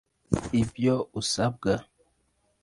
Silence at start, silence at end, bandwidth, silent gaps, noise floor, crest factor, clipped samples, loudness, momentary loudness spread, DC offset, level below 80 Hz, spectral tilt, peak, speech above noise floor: 0.3 s; 0.8 s; 11.5 kHz; none; -71 dBFS; 20 dB; under 0.1%; -28 LUFS; 5 LU; under 0.1%; -50 dBFS; -5.5 dB/octave; -8 dBFS; 45 dB